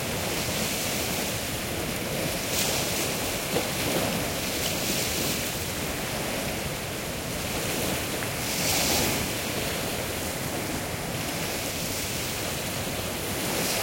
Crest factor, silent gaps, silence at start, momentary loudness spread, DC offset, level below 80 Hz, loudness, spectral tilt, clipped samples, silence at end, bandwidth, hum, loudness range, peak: 18 dB; none; 0 s; 5 LU; under 0.1%; -46 dBFS; -27 LUFS; -3 dB/octave; under 0.1%; 0 s; 16.5 kHz; none; 3 LU; -12 dBFS